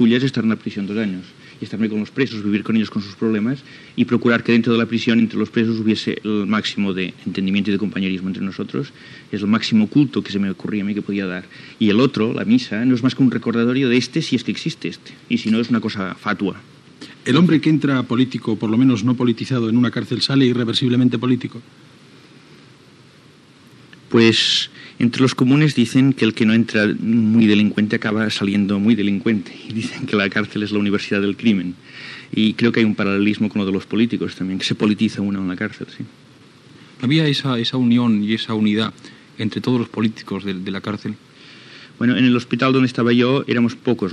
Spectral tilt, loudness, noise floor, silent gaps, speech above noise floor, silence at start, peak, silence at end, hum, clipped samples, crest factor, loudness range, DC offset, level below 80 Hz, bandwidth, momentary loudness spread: -6 dB/octave; -18 LUFS; -48 dBFS; none; 30 dB; 0 s; 0 dBFS; 0 s; none; under 0.1%; 18 dB; 6 LU; under 0.1%; -68 dBFS; 10.5 kHz; 10 LU